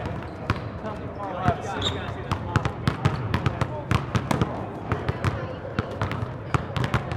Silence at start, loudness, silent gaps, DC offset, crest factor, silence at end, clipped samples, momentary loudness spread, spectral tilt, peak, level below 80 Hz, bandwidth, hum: 0 s; -28 LUFS; none; under 0.1%; 24 dB; 0 s; under 0.1%; 7 LU; -6.5 dB/octave; -4 dBFS; -42 dBFS; 14.5 kHz; none